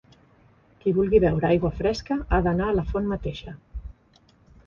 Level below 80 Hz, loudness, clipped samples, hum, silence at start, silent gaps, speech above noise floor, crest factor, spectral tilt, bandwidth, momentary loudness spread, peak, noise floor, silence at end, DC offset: -36 dBFS; -24 LUFS; under 0.1%; none; 0.85 s; none; 36 dB; 18 dB; -8 dB/octave; 7.4 kHz; 20 LU; -6 dBFS; -59 dBFS; 0.75 s; under 0.1%